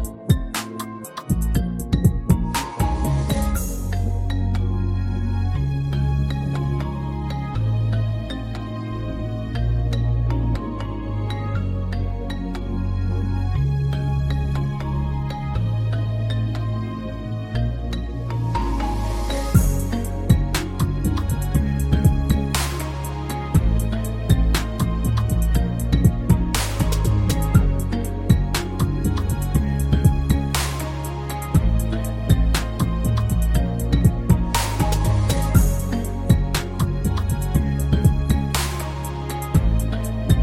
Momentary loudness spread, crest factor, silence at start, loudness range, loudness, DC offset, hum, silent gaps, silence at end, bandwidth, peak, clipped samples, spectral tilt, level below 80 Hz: 8 LU; 18 dB; 0 s; 5 LU; -22 LUFS; under 0.1%; none; none; 0 s; 16.5 kHz; -2 dBFS; under 0.1%; -6 dB/octave; -26 dBFS